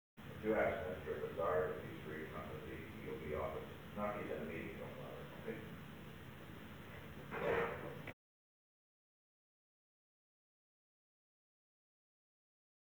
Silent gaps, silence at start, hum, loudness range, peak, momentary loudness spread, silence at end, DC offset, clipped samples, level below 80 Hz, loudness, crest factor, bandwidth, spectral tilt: none; 0.15 s; none; 7 LU; -24 dBFS; 15 LU; 4.8 s; under 0.1%; under 0.1%; -66 dBFS; -44 LUFS; 22 dB; over 20 kHz; -6.5 dB/octave